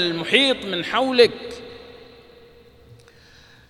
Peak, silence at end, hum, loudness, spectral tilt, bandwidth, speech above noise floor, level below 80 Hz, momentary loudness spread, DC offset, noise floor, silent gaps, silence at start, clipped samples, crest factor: 0 dBFS; 1.75 s; none; -18 LUFS; -4 dB/octave; 12.5 kHz; 30 dB; -58 dBFS; 22 LU; under 0.1%; -50 dBFS; none; 0 s; under 0.1%; 24 dB